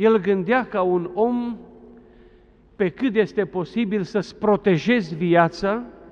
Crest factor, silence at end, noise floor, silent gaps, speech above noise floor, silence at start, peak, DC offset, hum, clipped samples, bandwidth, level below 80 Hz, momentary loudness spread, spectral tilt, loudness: 18 dB; 0.2 s; -52 dBFS; none; 32 dB; 0 s; -4 dBFS; under 0.1%; none; under 0.1%; 7.4 kHz; -54 dBFS; 8 LU; -7.5 dB/octave; -22 LUFS